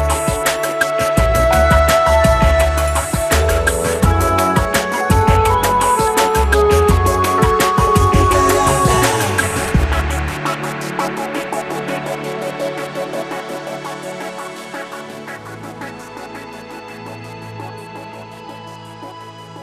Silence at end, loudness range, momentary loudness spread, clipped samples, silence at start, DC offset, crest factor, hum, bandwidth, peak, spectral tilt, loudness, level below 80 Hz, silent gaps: 0 s; 17 LU; 19 LU; under 0.1%; 0 s; under 0.1%; 16 dB; none; 14.5 kHz; 0 dBFS; -4.5 dB/octave; -15 LUFS; -24 dBFS; none